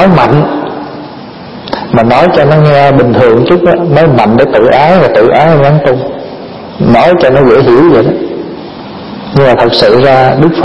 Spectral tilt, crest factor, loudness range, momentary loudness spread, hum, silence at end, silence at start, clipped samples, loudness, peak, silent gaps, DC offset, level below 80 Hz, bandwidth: -8.5 dB/octave; 6 dB; 3 LU; 18 LU; none; 0 s; 0 s; 3%; -6 LUFS; 0 dBFS; none; under 0.1%; -34 dBFS; 10 kHz